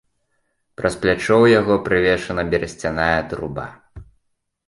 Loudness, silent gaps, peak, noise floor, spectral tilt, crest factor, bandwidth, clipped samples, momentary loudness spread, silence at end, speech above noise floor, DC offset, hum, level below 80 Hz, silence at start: -18 LUFS; none; -2 dBFS; -69 dBFS; -6 dB/octave; 18 dB; 11.5 kHz; under 0.1%; 14 LU; 0.65 s; 51 dB; under 0.1%; none; -42 dBFS; 0.8 s